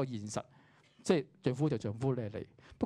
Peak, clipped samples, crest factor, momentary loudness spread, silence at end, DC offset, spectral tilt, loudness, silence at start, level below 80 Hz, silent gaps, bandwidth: -16 dBFS; under 0.1%; 20 dB; 13 LU; 0 s; under 0.1%; -6.5 dB/octave; -36 LUFS; 0 s; -68 dBFS; none; 11.5 kHz